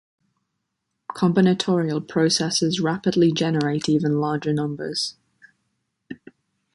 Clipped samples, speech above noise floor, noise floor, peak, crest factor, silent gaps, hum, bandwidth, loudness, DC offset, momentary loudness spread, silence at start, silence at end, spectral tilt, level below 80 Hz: under 0.1%; 57 dB; -78 dBFS; -6 dBFS; 18 dB; none; none; 11.5 kHz; -21 LUFS; under 0.1%; 19 LU; 1.1 s; 0.6 s; -5 dB/octave; -62 dBFS